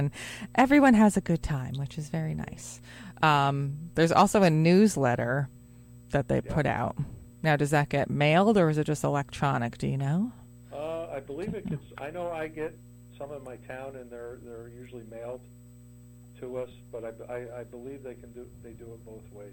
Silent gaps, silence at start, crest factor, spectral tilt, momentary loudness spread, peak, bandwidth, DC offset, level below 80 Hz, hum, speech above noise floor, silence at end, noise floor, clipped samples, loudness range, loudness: none; 0 s; 20 dB; -6.5 dB/octave; 23 LU; -8 dBFS; 16.5 kHz; under 0.1%; -52 dBFS; 60 Hz at -50 dBFS; 23 dB; 0 s; -50 dBFS; under 0.1%; 17 LU; -26 LUFS